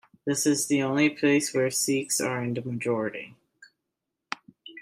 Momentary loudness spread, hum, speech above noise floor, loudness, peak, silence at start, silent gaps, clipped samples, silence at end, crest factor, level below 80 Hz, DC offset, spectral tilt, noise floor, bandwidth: 16 LU; none; 59 dB; -26 LUFS; -10 dBFS; 0.25 s; none; under 0.1%; 0 s; 18 dB; -72 dBFS; under 0.1%; -4 dB/octave; -84 dBFS; 15.5 kHz